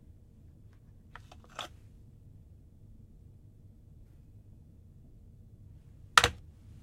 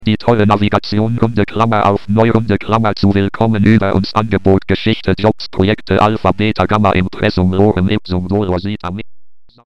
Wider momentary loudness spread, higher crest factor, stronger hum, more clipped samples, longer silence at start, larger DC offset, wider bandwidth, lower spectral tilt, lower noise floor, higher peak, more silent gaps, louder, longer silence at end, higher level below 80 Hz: first, 32 LU vs 4 LU; first, 36 dB vs 14 dB; neither; neither; first, 1.6 s vs 0 s; second, under 0.1% vs 4%; first, 16 kHz vs 8 kHz; second, -1.5 dB/octave vs -8 dB/octave; first, -56 dBFS vs -36 dBFS; about the same, -2 dBFS vs 0 dBFS; neither; second, -29 LUFS vs -14 LUFS; first, 0.45 s vs 0 s; second, -56 dBFS vs -36 dBFS